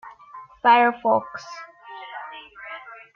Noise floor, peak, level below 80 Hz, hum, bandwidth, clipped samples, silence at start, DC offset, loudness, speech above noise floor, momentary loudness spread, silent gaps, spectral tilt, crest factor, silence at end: -44 dBFS; -4 dBFS; -70 dBFS; none; 7 kHz; under 0.1%; 0.05 s; under 0.1%; -19 LUFS; 25 dB; 24 LU; none; -4.5 dB/octave; 20 dB; 0.2 s